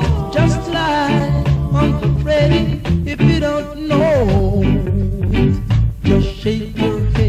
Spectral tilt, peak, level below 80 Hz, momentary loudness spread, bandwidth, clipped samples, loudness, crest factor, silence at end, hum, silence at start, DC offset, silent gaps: -7.5 dB/octave; -2 dBFS; -24 dBFS; 5 LU; 9.8 kHz; under 0.1%; -16 LUFS; 14 dB; 0 s; none; 0 s; under 0.1%; none